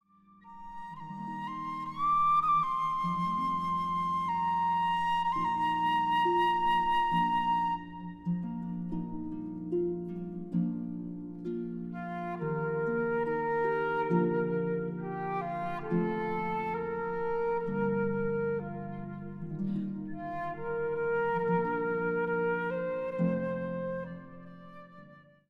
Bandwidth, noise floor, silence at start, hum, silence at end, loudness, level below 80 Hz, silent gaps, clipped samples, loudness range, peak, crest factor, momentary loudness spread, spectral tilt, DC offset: 9.2 kHz; -58 dBFS; 0.45 s; none; 0.3 s; -32 LUFS; -58 dBFS; none; under 0.1%; 7 LU; -16 dBFS; 16 dB; 13 LU; -8 dB/octave; under 0.1%